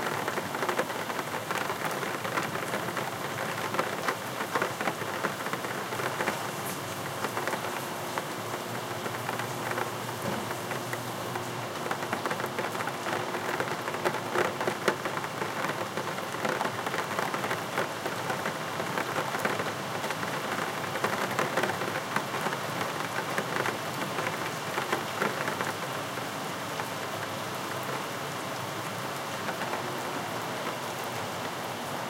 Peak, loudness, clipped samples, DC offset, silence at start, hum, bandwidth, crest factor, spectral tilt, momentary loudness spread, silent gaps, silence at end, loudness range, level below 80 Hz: -10 dBFS; -32 LUFS; under 0.1%; under 0.1%; 0 s; none; 17 kHz; 22 dB; -3.5 dB/octave; 4 LU; none; 0 s; 3 LU; -74 dBFS